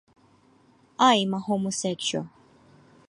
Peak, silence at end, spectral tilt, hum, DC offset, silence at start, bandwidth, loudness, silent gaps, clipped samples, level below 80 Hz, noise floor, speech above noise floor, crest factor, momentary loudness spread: -8 dBFS; 0.8 s; -3.5 dB/octave; none; under 0.1%; 1 s; 11.5 kHz; -24 LUFS; none; under 0.1%; -70 dBFS; -60 dBFS; 35 dB; 20 dB; 17 LU